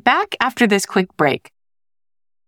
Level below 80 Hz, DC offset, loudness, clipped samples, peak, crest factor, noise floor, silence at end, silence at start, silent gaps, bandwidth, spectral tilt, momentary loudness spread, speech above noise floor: -60 dBFS; under 0.1%; -18 LUFS; under 0.1%; -2 dBFS; 18 dB; under -90 dBFS; 1.1 s; 0.05 s; none; 18 kHz; -4 dB/octave; 5 LU; over 72 dB